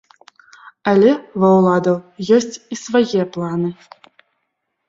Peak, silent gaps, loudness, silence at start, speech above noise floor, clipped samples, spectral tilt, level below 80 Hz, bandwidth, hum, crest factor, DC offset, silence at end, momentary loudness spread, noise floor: -2 dBFS; none; -16 LUFS; 0.85 s; 58 dB; under 0.1%; -6.5 dB/octave; -60 dBFS; 7.8 kHz; none; 16 dB; under 0.1%; 1.15 s; 11 LU; -73 dBFS